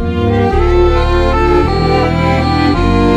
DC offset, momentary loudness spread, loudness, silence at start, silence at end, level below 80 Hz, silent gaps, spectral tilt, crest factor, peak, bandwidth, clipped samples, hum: under 0.1%; 1 LU; -12 LUFS; 0 s; 0 s; -16 dBFS; none; -7.5 dB/octave; 10 dB; 0 dBFS; 9.4 kHz; under 0.1%; none